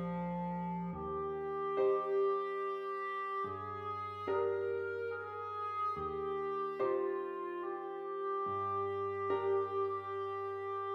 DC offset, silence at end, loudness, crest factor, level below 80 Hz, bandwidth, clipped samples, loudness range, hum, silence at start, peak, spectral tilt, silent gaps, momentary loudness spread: under 0.1%; 0 s; -37 LUFS; 14 dB; -68 dBFS; 5.6 kHz; under 0.1%; 2 LU; none; 0 s; -22 dBFS; -8.5 dB/octave; none; 7 LU